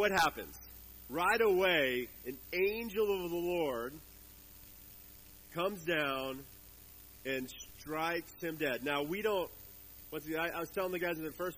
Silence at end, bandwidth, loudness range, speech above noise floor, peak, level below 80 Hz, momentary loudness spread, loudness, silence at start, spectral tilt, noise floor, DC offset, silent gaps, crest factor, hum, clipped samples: 0 s; 15.5 kHz; 7 LU; 21 dB; -16 dBFS; -62 dBFS; 23 LU; -35 LUFS; 0 s; -4 dB/octave; -56 dBFS; under 0.1%; none; 20 dB; none; under 0.1%